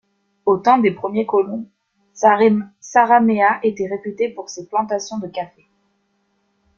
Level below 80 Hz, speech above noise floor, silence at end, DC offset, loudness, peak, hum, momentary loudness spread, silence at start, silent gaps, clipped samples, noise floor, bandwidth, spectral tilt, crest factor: -64 dBFS; 49 dB; 1.3 s; under 0.1%; -18 LUFS; -2 dBFS; none; 13 LU; 0.45 s; none; under 0.1%; -66 dBFS; 7.4 kHz; -5.5 dB/octave; 16 dB